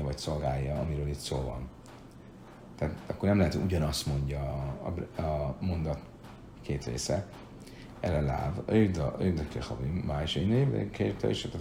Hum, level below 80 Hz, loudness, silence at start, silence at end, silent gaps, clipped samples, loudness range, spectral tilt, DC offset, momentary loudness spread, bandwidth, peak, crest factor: none; -44 dBFS; -32 LUFS; 0 s; 0 s; none; under 0.1%; 5 LU; -6.5 dB/octave; under 0.1%; 21 LU; 16 kHz; -14 dBFS; 18 dB